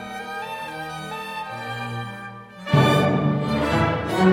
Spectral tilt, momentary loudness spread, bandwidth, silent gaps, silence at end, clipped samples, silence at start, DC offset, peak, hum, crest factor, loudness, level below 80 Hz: -6.5 dB/octave; 14 LU; 16.5 kHz; none; 0 s; under 0.1%; 0 s; under 0.1%; -4 dBFS; none; 18 dB; -23 LUFS; -48 dBFS